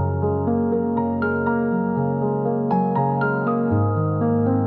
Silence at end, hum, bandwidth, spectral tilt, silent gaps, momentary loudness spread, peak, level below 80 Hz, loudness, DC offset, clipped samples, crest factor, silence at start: 0 s; none; 4.4 kHz; -13 dB/octave; none; 2 LU; -8 dBFS; -52 dBFS; -21 LUFS; under 0.1%; under 0.1%; 12 dB; 0 s